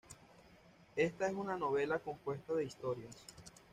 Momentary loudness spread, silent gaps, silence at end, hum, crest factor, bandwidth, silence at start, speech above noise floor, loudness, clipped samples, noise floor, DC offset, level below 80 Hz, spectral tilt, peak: 19 LU; none; 0.25 s; none; 20 dB; 14.5 kHz; 0.1 s; 25 dB; -39 LUFS; under 0.1%; -64 dBFS; under 0.1%; -72 dBFS; -5.5 dB/octave; -20 dBFS